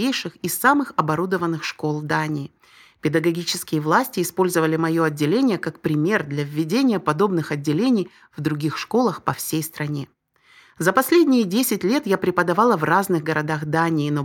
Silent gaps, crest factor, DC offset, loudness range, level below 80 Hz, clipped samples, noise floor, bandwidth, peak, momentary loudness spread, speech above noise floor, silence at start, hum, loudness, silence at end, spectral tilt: none; 18 dB; under 0.1%; 4 LU; -64 dBFS; under 0.1%; -54 dBFS; 19 kHz; -2 dBFS; 8 LU; 34 dB; 0 s; none; -21 LUFS; 0 s; -5.5 dB/octave